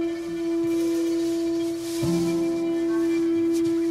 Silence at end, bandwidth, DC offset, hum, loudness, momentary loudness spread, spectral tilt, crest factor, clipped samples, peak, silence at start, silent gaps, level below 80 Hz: 0 s; 14 kHz; under 0.1%; none; -24 LUFS; 4 LU; -6 dB/octave; 10 dB; under 0.1%; -14 dBFS; 0 s; none; -56 dBFS